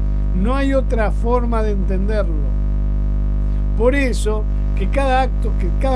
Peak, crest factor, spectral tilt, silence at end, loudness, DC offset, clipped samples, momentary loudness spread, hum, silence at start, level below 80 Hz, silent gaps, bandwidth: -2 dBFS; 14 dB; -7 dB/octave; 0 s; -19 LUFS; under 0.1%; under 0.1%; 4 LU; 50 Hz at -15 dBFS; 0 s; -18 dBFS; none; 11 kHz